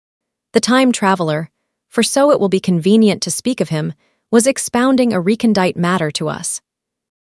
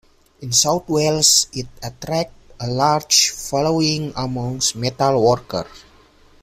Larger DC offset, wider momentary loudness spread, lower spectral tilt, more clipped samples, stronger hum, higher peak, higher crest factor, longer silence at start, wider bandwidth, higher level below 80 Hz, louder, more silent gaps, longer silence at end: neither; second, 10 LU vs 16 LU; first, -4.5 dB/octave vs -3 dB/octave; neither; neither; about the same, 0 dBFS vs 0 dBFS; about the same, 16 dB vs 20 dB; first, 0.55 s vs 0.4 s; second, 12 kHz vs 16 kHz; second, -58 dBFS vs -48 dBFS; about the same, -15 LUFS vs -17 LUFS; neither; about the same, 0.7 s vs 0.65 s